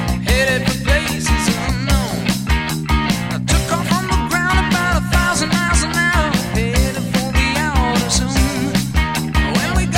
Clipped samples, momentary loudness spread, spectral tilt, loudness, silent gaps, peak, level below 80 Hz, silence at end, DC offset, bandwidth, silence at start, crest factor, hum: under 0.1%; 3 LU; -4.5 dB/octave; -17 LUFS; none; -2 dBFS; -22 dBFS; 0 s; under 0.1%; 17 kHz; 0 s; 16 dB; none